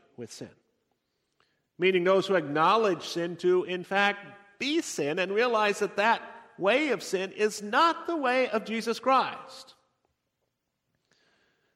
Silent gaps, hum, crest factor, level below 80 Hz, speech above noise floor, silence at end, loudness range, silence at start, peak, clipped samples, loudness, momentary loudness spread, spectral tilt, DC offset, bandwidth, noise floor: none; none; 18 dB; -80 dBFS; 54 dB; 2.15 s; 3 LU; 0.2 s; -10 dBFS; under 0.1%; -27 LUFS; 17 LU; -4 dB/octave; under 0.1%; 15 kHz; -81 dBFS